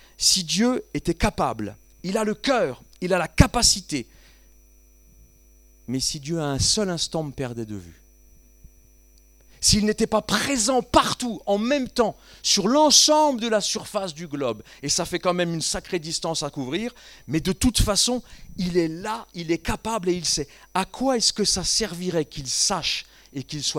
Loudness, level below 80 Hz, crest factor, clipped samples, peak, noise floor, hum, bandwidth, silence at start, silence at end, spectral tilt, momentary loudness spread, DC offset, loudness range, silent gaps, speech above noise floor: -22 LUFS; -40 dBFS; 24 dB; under 0.1%; 0 dBFS; -54 dBFS; none; 19 kHz; 0.2 s; 0 s; -3 dB/octave; 12 LU; under 0.1%; 7 LU; none; 30 dB